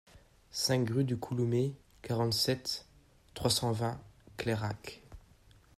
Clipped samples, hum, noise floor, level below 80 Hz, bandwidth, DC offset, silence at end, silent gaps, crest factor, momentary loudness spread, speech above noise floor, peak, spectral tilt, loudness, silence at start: under 0.1%; none; -61 dBFS; -60 dBFS; 15 kHz; under 0.1%; 0.6 s; none; 20 dB; 18 LU; 29 dB; -16 dBFS; -5 dB/octave; -33 LUFS; 0.15 s